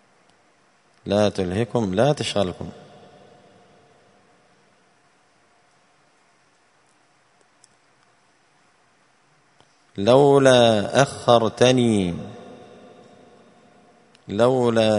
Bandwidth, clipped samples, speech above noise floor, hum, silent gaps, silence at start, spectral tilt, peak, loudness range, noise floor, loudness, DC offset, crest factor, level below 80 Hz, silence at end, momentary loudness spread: 11 kHz; under 0.1%; 42 dB; none; none; 1.05 s; -5.5 dB/octave; 0 dBFS; 9 LU; -61 dBFS; -19 LUFS; under 0.1%; 22 dB; -58 dBFS; 0 s; 23 LU